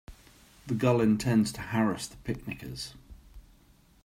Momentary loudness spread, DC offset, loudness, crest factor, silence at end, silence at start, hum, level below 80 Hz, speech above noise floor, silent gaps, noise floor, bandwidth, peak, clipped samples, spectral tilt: 15 LU; under 0.1%; -29 LUFS; 20 dB; 0.65 s; 0.1 s; none; -54 dBFS; 32 dB; none; -60 dBFS; 16 kHz; -12 dBFS; under 0.1%; -6 dB/octave